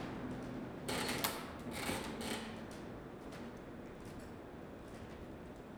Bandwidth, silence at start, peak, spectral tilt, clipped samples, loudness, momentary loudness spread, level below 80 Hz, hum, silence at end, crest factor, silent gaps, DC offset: over 20 kHz; 0 s; -16 dBFS; -4 dB/octave; under 0.1%; -44 LUFS; 12 LU; -60 dBFS; none; 0 s; 30 dB; none; under 0.1%